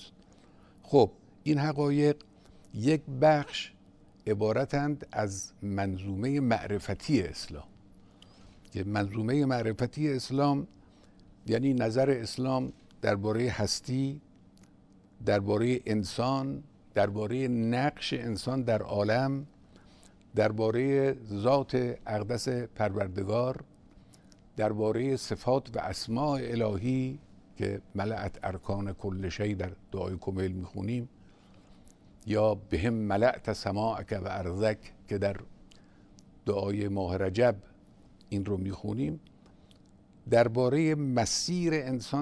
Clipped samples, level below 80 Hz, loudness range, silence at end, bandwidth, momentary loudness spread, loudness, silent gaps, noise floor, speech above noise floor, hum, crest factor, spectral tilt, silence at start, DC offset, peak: under 0.1%; -56 dBFS; 4 LU; 0 s; 11 kHz; 11 LU; -30 LUFS; none; -58 dBFS; 29 dB; none; 22 dB; -6 dB/octave; 0 s; under 0.1%; -10 dBFS